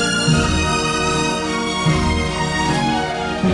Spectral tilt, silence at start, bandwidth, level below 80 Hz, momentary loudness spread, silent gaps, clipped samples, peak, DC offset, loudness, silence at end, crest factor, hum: -4.5 dB/octave; 0 s; 11 kHz; -32 dBFS; 4 LU; none; under 0.1%; -4 dBFS; under 0.1%; -18 LUFS; 0 s; 14 dB; none